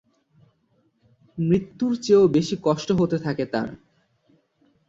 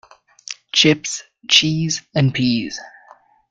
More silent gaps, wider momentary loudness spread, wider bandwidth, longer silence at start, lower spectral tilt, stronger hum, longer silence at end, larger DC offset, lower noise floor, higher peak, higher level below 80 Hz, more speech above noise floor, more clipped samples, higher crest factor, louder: neither; second, 11 LU vs 18 LU; second, 7.8 kHz vs 9.4 kHz; first, 1.35 s vs 0.5 s; first, -7 dB/octave vs -3.5 dB/octave; neither; first, 1.15 s vs 0.6 s; neither; first, -66 dBFS vs -49 dBFS; second, -6 dBFS vs 0 dBFS; about the same, -58 dBFS vs -54 dBFS; first, 45 dB vs 32 dB; neither; about the same, 18 dB vs 20 dB; second, -22 LUFS vs -16 LUFS